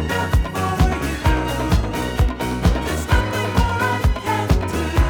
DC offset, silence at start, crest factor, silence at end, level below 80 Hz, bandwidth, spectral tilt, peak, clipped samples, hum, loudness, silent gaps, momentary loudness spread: under 0.1%; 0 s; 16 dB; 0 s; -22 dBFS; over 20 kHz; -6 dB/octave; -2 dBFS; under 0.1%; none; -20 LUFS; none; 2 LU